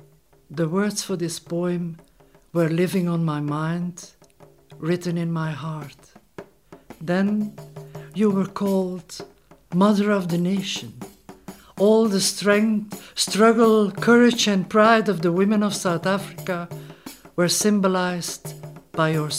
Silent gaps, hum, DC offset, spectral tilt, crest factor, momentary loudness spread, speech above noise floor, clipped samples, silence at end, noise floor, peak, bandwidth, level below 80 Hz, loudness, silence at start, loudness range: none; none; under 0.1%; -5 dB/octave; 18 dB; 20 LU; 34 dB; under 0.1%; 0 s; -54 dBFS; -4 dBFS; 16 kHz; -62 dBFS; -21 LUFS; 0.5 s; 9 LU